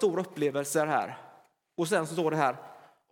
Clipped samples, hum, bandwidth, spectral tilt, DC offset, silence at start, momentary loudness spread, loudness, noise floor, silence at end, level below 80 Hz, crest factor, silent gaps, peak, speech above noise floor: under 0.1%; none; 17.5 kHz; -5 dB/octave; under 0.1%; 0 s; 15 LU; -29 LUFS; -59 dBFS; 0.35 s; -84 dBFS; 20 dB; none; -10 dBFS; 31 dB